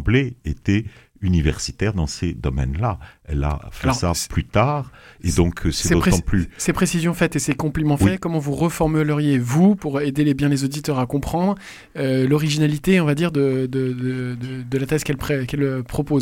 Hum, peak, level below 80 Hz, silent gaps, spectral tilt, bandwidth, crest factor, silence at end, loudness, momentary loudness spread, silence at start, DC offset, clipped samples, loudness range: none; -2 dBFS; -34 dBFS; none; -6 dB/octave; 17 kHz; 18 dB; 0 s; -21 LUFS; 8 LU; 0 s; under 0.1%; under 0.1%; 4 LU